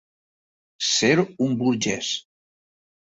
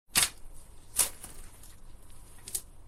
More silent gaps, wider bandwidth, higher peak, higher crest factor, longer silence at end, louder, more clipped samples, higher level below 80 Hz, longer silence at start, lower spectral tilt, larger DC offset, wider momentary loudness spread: neither; second, 8 kHz vs 16.5 kHz; about the same, -6 dBFS vs -6 dBFS; second, 18 dB vs 30 dB; first, 0.9 s vs 0 s; first, -22 LUFS vs -30 LUFS; neither; second, -64 dBFS vs -50 dBFS; first, 0.8 s vs 0.1 s; first, -3.5 dB/octave vs 0.5 dB/octave; neither; second, 9 LU vs 26 LU